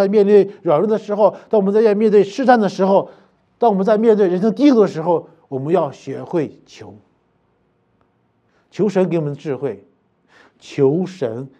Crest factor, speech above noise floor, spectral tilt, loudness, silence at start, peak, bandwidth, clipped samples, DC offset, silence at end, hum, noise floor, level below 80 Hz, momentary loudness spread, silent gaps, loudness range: 18 dB; 46 dB; -8 dB/octave; -16 LUFS; 0 s; 0 dBFS; 8.4 kHz; under 0.1%; under 0.1%; 0.15 s; none; -62 dBFS; -72 dBFS; 13 LU; none; 10 LU